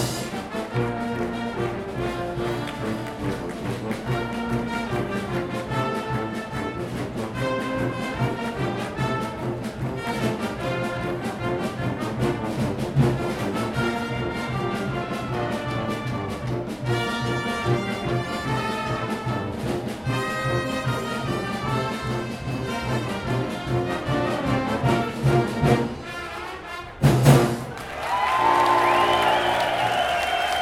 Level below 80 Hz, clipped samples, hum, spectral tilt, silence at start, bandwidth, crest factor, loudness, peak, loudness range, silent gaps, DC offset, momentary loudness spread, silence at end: -44 dBFS; under 0.1%; none; -6 dB/octave; 0 s; 16.5 kHz; 22 dB; -25 LUFS; -2 dBFS; 7 LU; none; under 0.1%; 9 LU; 0 s